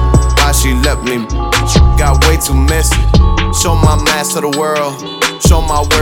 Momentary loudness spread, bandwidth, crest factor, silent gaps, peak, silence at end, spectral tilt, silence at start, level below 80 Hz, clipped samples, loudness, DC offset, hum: 6 LU; 17.5 kHz; 10 dB; none; 0 dBFS; 0 s; -4.5 dB/octave; 0 s; -14 dBFS; 0.1%; -11 LUFS; under 0.1%; none